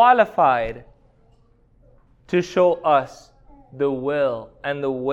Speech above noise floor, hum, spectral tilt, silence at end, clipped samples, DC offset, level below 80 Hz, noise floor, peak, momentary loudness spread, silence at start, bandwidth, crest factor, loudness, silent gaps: 37 dB; none; -6 dB/octave; 0 s; under 0.1%; under 0.1%; -52 dBFS; -56 dBFS; -4 dBFS; 13 LU; 0 s; 8.2 kHz; 18 dB; -21 LUFS; none